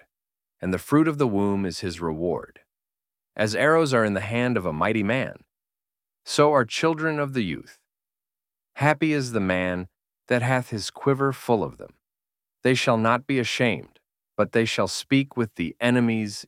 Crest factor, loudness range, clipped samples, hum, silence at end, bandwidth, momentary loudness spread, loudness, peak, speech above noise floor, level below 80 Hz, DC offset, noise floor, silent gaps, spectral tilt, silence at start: 22 dB; 3 LU; under 0.1%; none; 0.05 s; 16 kHz; 11 LU; -24 LUFS; -4 dBFS; over 67 dB; -58 dBFS; under 0.1%; under -90 dBFS; none; -5.5 dB/octave; 0.6 s